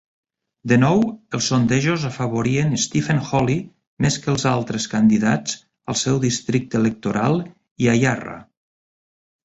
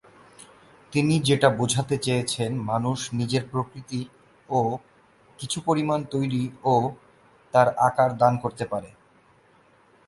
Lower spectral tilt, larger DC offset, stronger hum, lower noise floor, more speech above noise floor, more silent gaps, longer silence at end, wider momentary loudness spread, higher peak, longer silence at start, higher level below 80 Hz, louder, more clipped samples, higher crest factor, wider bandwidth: about the same, -5 dB/octave vs -5.5 dB/octave; neither; neither; first, under -90 dBFS vs -58 dBFS; first, over 71 dB vs 35 dB; first, 3.87-3.97 s, 7.71-7.76 s vs none; second, 1.05 s vs 1.2 s; second, 9 LU vs 12 LU; about the same, -4 dBFS vs -4 dBFS; second, 0.65 s vs 0.9 s; first, -50 dBFS vs -60 dBFS; first, -20 LUFS vs -24 LUFS; neither; second, 16 dB vs 22 dB; second, 8.2 kHz vs 11.5 kHz